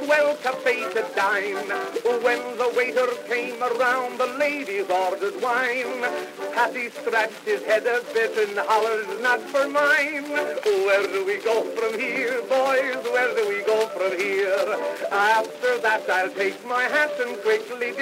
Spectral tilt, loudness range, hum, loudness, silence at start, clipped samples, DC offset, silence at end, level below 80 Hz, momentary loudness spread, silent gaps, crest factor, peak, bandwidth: -2.5 dB/octave; 2 LU; none; -23 LUFS; 0 s; under 0.1%; under 0.1%; 0 s; -82 dBFS; 6 LU; none; 16 dB; -8 dBFS; 16 kHz